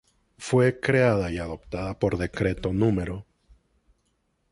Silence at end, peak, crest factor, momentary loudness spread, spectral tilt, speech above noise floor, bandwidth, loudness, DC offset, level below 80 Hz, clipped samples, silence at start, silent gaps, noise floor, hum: 1.3 s; -6 dBFS; 20 dB; 12 LU; -7 dB/octave; 47 dB; 11.5 kHz; -25 LUFS; under 0.1%; -44 dBFS; under 0.1%; 0.4 s; none; -72 dBFS; none